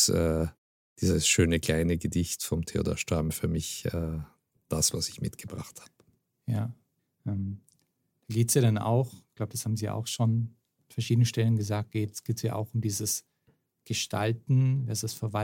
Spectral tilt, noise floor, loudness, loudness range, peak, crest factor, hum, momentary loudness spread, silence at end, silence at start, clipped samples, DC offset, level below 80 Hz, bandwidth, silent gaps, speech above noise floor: -4.5 dB/octave; -74 dBFS; -29 LUFS; 5 LU; -10 dBFS; 20 dB; none; 14 LU; 0 s; 0 s; under 0.1%; under 0.1%; -48 dBFS; 17 kHz; 0.58-0.96 s; 46 dB